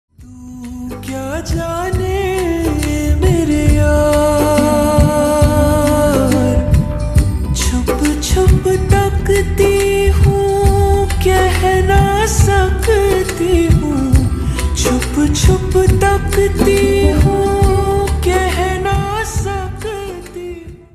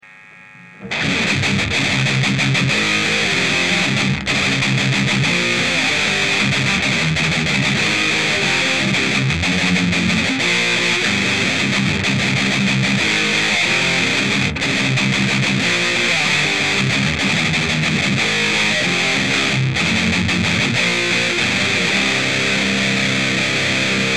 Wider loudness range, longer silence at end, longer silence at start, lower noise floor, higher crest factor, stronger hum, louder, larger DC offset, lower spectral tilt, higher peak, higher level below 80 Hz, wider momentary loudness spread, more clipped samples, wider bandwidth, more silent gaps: first, 3 LU vs 0 LU; first, 0.2 s vs 0 s; first, 0.2 s vs 0.05 s; second, -33 dBFS vs -42 dBFS; about the same, 12 dB vs 16 dB; neither; about the same, -14 LUFS vs -15 LUFS; second, under 0.1% vs 0.7%; first, -6 dB/octave vs -3.5 dB/octave; about the same, 0 dBFS vs -2 dBFS; first, -20 dBFS vs -44 dBFS; first, 10 LU vs 2 LU; neither; first, 14.5 kHz vs 13 kHz; neither